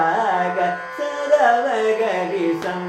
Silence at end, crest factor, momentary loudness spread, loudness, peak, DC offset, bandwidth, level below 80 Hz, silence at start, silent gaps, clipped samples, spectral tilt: 0 s; 16 dB; 9 LU; -20 LUFS; -4 dBFS; under 0.1%; 14 kHz; -66 dBFS; 0 s; none; under 0.1%; -5 dB/octave